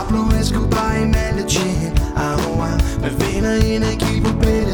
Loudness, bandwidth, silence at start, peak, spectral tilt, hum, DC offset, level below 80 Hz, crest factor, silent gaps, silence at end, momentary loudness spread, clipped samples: -18 LUFS; over 20 kHz; 0 s; -2 dBFS; -5.5 dB/octave; none; under 0.1%; -22 dBFS; 14 dB; none; 0 s; 3 LU; under 0.1%